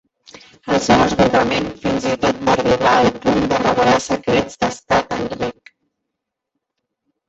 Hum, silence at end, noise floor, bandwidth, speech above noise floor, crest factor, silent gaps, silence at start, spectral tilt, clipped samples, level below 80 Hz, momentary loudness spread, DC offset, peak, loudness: none; 1.8 s; -80 dBFS; 8.2 kHz; 64 dB; 16 dB; none; 0.65 s; -5 dB/octave; under 0.1%; -42 dBFS; 9 LU; under 0.1%; -2 dBFS; -17 LUFS